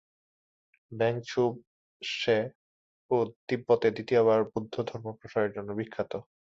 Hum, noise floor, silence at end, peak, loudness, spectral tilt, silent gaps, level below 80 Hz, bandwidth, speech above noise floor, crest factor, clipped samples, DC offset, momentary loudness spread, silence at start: none; under -90 dBFS; 0.3 s; -12 dBFS; -29 LUFS; -6 dB/octave; 1.67-2.00 s, 2.55-3.09 s, 3.36-3.48 s; -68 dBFS; 7.6 kHz; over 61 dB; 18 dB; under 0.1%; under 0.1%; 11 LU; 0.9 s